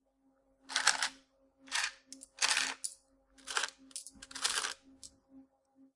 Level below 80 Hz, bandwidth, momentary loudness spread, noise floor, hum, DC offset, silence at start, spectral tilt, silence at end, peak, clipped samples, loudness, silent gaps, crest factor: -76 dBFS; 11.5 kHz; 22 LU; -73 dBFS; none; under 0.1%; 0.7 s; 2.5 dB/octave; 0.55 s; -8 dBFS; under 0.1%; -34 LUFS; none; 32 dB